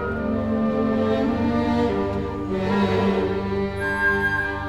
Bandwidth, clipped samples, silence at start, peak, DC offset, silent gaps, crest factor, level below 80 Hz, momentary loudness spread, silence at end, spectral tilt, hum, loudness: 12 kHz; under 0.1%; 0 s; -8 dBFS; 0.4%; none; 14 dB; -38 dBFS; 5 LU; 0 s; -7.5 dB/octave; 50 Hz at -40 dBFS; -22 LUFS